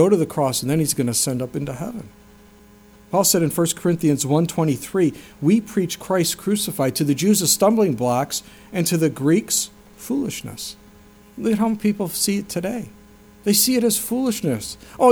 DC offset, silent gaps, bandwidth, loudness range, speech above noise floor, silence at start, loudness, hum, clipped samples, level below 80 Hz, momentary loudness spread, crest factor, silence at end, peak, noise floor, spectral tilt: under 0.1%; none; over 20 kHz; 4 LU; 28 dB; 0 s; -20 LUFS; none; under 0.1%; -54 dBFS; 12 LU; 18 dB; 0 s; -2 dBFS; -48 dBFS; -4.5 dB/octave